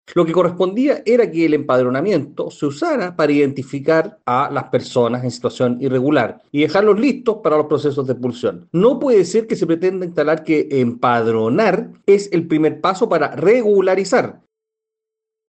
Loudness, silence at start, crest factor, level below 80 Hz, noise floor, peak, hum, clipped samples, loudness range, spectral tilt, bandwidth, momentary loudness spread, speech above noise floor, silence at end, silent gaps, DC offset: -17 LUFS; 0.1 s; 14 dB; -62 dBFS; -83 dBFS; -4 dBFS; none; under 0.1%; 2 LU; -6.5 dB/octave; 8.8 kHz; 6 LU; 67 dB; 1.15 s; none; under 0.1%